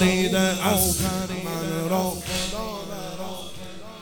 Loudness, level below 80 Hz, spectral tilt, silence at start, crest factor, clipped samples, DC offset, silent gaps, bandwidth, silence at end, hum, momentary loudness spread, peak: -24 LUFS; -44 dBFS; -4 dB/octave; 0 s; 18 dB; under 0.1%; under 0.1%; none; over 20 kHz; 0 s; none; 15 LU; -6 dBFS